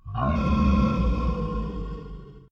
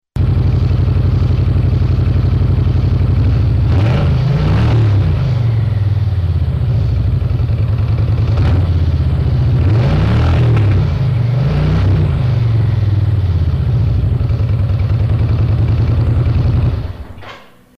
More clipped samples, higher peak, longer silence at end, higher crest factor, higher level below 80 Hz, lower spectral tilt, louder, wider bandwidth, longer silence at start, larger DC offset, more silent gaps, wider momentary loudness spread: neither; about the same, -10 dBFS vs -8 dBFS; second, 0.1 s vs 0.4 s; first, 14 dB vs 6 dB; second, -28 dBFS vs -22 dBFS; about the same, -9 dB/octave vs -9 dB/octave; second, -25 LUFS vs -14 LUFS; first, 6.8 kHz vs 6 kHz; about the same, 0.05 s vs 0.15 s; neither; neither; first, 17 LU vs 3 LU